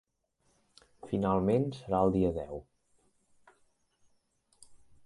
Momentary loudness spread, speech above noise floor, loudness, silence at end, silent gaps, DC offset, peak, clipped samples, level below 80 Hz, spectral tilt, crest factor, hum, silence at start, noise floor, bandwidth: 13 LU; 46 dB; -30 LUFS; 0.3 s; none; under 0.1%; -14 dBFS; under 0.1%; -54 dBFS; -9 dB/octave; 22 dB; none; 1.05 s; -75 dBFS; 11.5 kHz